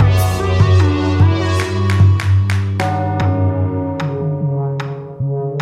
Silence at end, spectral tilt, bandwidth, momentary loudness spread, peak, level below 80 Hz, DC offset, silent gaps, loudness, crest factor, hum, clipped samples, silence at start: 0 s; -7 dB/octave; 13.5 kHz; 8 LU; -2 dBFS; -34 dBFS; under 0.1%; none; -16 LUFS; 14 dB; none; under 0.1%; 0 s